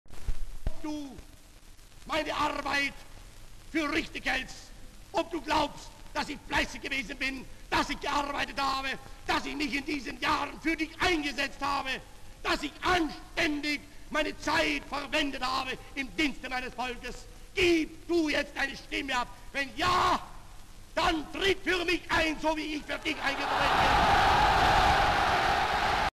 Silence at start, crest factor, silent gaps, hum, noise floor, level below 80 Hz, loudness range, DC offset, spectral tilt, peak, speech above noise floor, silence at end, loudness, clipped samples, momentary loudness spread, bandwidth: 0.05 s; 16 dB; none; none; -51 dBFS; -44 dBFS; 7 LU; under 0.1%; -3.5 dB/octave; -14 dBFS; 21 dB; 0.05 s; -29 LUFS; under 0.1%; 13 LU; 13.5 kHz